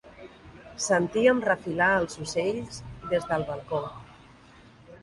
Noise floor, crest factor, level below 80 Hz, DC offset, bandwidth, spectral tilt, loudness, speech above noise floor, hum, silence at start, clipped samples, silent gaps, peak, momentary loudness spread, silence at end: -53 dBFS; 20 dB; -56 dBFS; under 0.1%; 11.5 kHz; -4.5 dB/octave; -26 LUFS; 27 dB; none; 0.05 s; under 0.1%; none; -8 dBFS; 23 LU; 0.05 s